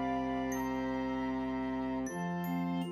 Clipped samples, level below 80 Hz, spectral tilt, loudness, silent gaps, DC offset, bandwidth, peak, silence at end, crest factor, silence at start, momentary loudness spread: under 0.1%; -56 dBFS; -6.5 dB/octave; -36 LUFS; none; under 0.1%; 14 kHz; -22 dBFS; 0 s; 12 dB; 0 s; 2 LU